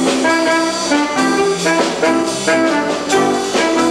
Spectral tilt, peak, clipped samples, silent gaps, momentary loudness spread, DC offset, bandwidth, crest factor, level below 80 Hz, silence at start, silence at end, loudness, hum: -3 dB/octave; -2 dBFS; under 0.1%; none; 2 LU; under 0.1%; 13.5 kHz; 12 dB; -50 dBFS; 0 s; 0 s; -14 LUFS; none